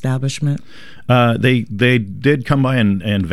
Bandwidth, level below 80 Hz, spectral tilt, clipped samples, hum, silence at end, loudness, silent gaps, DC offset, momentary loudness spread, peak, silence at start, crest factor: 12.5 kHz; -42 dBFS; -6.5 dB/octave; under 0.1%; none; 0 s; -16 LUFS; none; 1%; 7 LU; -2 dBFS; 0.05 s; 14 dB